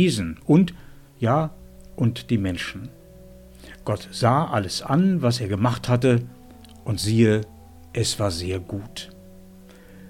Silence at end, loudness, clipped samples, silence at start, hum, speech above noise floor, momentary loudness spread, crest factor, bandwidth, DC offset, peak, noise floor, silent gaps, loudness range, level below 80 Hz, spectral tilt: 0 s; -23 LUFS; under 0.1%; 0 s; none; 25 dB; 17 LU; 20 dB; 16 kHz; under 0.1%; -4 dBFS; -46 dBFS; none; 4 LU; -48 dBFS; -6 dB/octave